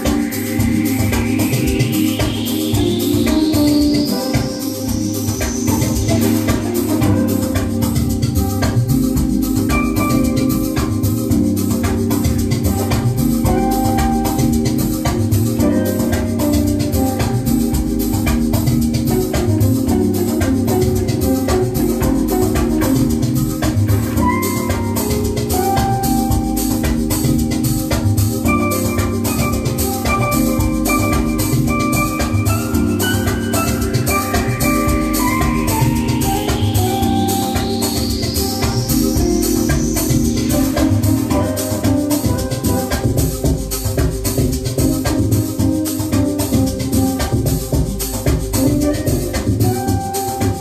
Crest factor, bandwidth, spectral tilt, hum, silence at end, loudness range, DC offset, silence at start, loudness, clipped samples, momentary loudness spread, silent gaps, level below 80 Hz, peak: 12 dB; 15 kHz; -5.5 dB/octave; none; 0 s; 1 LU; under 0.1%; 0 s; -17 LUFS; under 0.1%; 3 LU; none; -26 dBFS; -2 dBFS